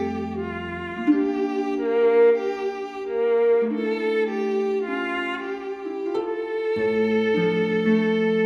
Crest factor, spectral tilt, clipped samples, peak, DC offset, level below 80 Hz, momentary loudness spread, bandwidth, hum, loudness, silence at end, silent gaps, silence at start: 14 dB; -7 dB/octave; under 0.1%; -8 dBFS; under 0.1%; -58 dBFS; 10 LU; 6.6 kHz; none; -23 LUFS; 0 s; none; 0 s